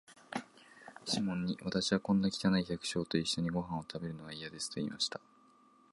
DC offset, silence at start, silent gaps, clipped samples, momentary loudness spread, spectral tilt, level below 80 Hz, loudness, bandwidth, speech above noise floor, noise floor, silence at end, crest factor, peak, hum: under 0.1%; 0.1 s; none; under 0.1%; 13 LU; -4.5 dB/octave; -64 dBFS; -35 LUFS; 11.5 kHz; 30 dB; -65 dBFS; 0.75 s; 20 dB; -16 dBFS; none